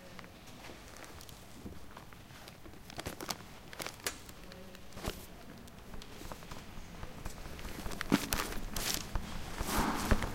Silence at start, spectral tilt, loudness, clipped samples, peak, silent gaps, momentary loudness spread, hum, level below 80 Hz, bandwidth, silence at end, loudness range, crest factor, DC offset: 0 s; -3.5 dB/octave; -40 LUFS; under 0.1%; -8 dBFS; none; 18 LU; none; -46 dBFS; 17 kHz; 0 s; 11 LU; 32 dB; 0.1%